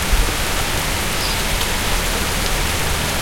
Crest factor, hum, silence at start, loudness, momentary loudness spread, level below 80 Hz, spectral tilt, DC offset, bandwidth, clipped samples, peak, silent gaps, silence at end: 16 dB; none; 0 s; -19 LUFS; 1 LU; -24 dBFS; -2.5 dB/octave; 0.5%; 16.5 kHz; under 0.1%; -2 dBFS; none; 0 s